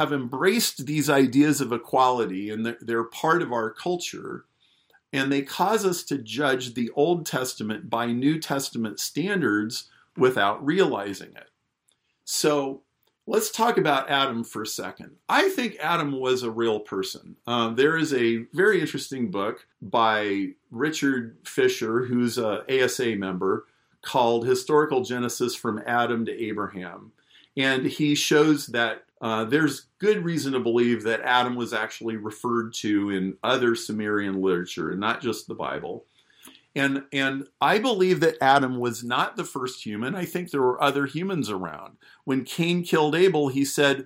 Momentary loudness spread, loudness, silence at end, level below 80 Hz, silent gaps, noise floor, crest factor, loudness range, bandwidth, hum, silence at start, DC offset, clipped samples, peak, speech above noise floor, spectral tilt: 10 LU; -24 LUFS; 0 s; -70 dBFS; none; -71 dBFS; 18 dB; 3 LU; 16 kHz; none; 0 s; under 0.1%; under 0.1%; -6 dBFS; 46 dB; -4.5 dB/octave